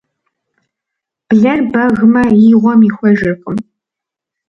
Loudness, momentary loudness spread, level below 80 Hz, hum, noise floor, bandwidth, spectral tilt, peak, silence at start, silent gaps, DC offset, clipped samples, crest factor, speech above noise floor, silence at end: -10 LUFS; 11 LU; -46 dBFS; none; -83 dBFS; 5.8 kHz; -9 dB/octave; 0 dBFS; 1.3 s; none; under 0.1%; under 0.1%; 12 dB; 74 dB; 0.85 s